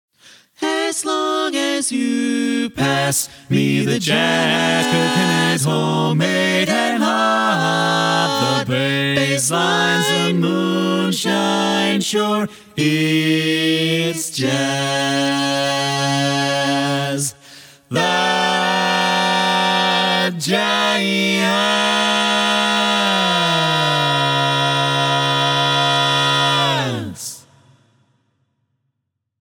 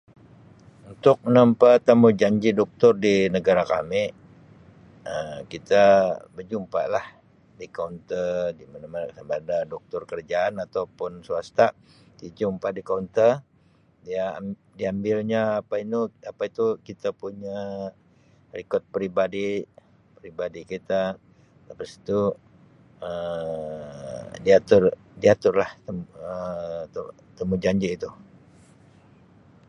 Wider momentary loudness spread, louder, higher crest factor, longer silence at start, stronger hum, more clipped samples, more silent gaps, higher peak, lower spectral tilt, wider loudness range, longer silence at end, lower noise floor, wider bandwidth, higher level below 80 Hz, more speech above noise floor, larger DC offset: second, 4 LU vs 19 LU; first, -16 LUFS vs -23 LUFS; second, 16 dB vs 22 dB; second, 0.6 s vs 0.85 s; neither; neither; neither; about the same, -2 dBFS vs -2 dBFS; second, -3.5 dB/octave vs -6.5 dB/octave; second, 3 LU vs 11 LU; first, 2 s vs 1.45 s; first, -75 dBFS vs -60 dBFS; first, 19.5 kHz vs 9.4 kHz; about the same, -62 dBFS vs -58 dBFS; first, 58 dB vs 36 dB; neither